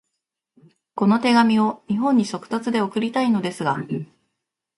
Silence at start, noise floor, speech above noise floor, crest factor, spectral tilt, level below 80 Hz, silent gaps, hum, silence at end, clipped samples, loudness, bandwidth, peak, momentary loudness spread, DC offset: 0.95 s; -80 dBFS; 60 dB; 16 dB; -6 dB/octave; -66 dBFS; none; none; 0.75 s; under 0.1%; -21 LUFS; 11.5 kHz; -4 dBFS; 12 LU; under 0.1%